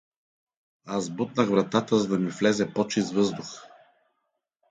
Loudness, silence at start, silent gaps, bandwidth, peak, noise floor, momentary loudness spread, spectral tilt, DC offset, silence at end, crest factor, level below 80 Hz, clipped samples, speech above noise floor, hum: -26 LUFS; 0.85 s; none; 9.4 kHz; -6 dBFS; -79 dBFS; 10 LU; -5.5 dB/octave; under 0.1%; 1.05 s; 20 dB; -68 dBFS; under 0.1%; 54 dB; none